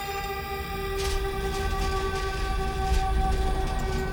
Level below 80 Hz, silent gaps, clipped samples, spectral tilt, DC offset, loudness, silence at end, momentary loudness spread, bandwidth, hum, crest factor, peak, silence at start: -30 dBFS; none; under 0.1%; -5 dB/octave; under 0.1%; -29 LUFS; 0 s; 5 LU; over 20 kHz; none; 14 dB; -12 dBFS; 0 s